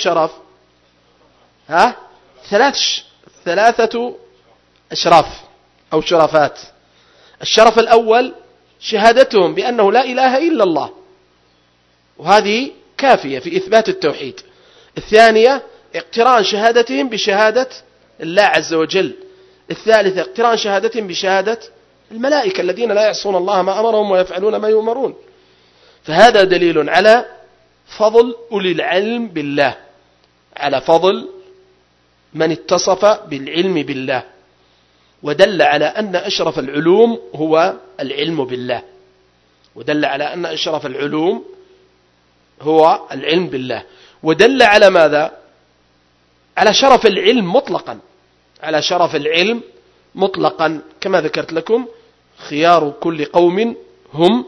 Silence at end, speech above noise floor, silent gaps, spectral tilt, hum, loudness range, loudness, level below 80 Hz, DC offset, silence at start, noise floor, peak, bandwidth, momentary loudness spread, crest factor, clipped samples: 0 s; 42 dB; none; -4 dB/octave; 60 Hz at -55 dBFS; 5 LU; -14 LUFS; -54 dBFS; under 0.1%; 0 s; -56 dBFS; 0 dBFS; 11 kHz; 14 LU; 16 dB; 0.3%